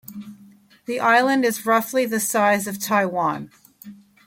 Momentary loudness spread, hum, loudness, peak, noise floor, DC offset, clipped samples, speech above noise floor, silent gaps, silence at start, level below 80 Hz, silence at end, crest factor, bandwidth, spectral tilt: 20 LU; none; -20 LUFS; -4 dBFS; -50 dBFS; under 0.1%; under 0.1%; 30 dB; none; 0.1 s; -68 dBFS; 0.3 s; 18 dB; 17 kHz; -3.5 dB/octave